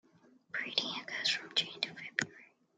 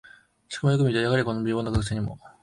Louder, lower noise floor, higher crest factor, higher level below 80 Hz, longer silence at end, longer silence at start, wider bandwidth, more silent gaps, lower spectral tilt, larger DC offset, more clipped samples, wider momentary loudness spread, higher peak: second, -35 LUFS vs -25 LUFS; first, -65 dBFS vs -45 dBFS; first, 28 dB vs 16 dB; second, -86 dBFS vs -44 dBFS; first, 0.3 s vs 0.15 s; about the same, 0.55 s vs 0.5 s; about the same, 11.5 kHz vs 11 kHz; neither; second, -1 dB/octave vs -6.5 dB/octave; neither; neither; second, 7 LU vs 10 LU; about the same, -12 dBFS vs -10 dBFS